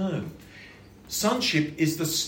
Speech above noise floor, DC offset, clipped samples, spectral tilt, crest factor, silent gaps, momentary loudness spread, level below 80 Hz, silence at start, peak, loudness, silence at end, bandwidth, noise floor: 23 dB; under 0.1%; under 0.1%; -3.5 dB/octave; 18 dB; none; 22 LU; -58 dBFS; 0 s; -10 dBFS; -26 LUFS; 0 s; 17 kHz; -48 dBFS